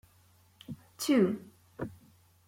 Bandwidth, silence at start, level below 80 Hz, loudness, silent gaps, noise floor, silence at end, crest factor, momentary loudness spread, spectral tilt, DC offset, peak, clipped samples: 16.5 kHz; 0.7 s; -68 dBFS; -31 LUFS; none; -64 dBFS; 0.55 s; 20 dB; 24 LU; -5.5 dB/octave; under 0.1%; -14 dBFS; under 0.1%